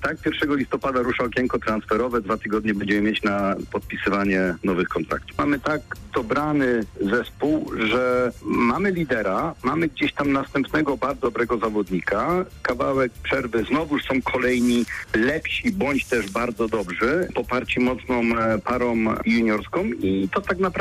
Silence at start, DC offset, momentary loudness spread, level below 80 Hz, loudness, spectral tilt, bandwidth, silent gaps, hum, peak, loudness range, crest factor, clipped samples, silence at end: 0 s; under 0.1%; 4 LU; -44 dBFS; -23 LUFS; -6 dB/octave; 15 kHz; none; none; -12 dBFS; 1 LU; 10 dB; under 0.1%; 0 s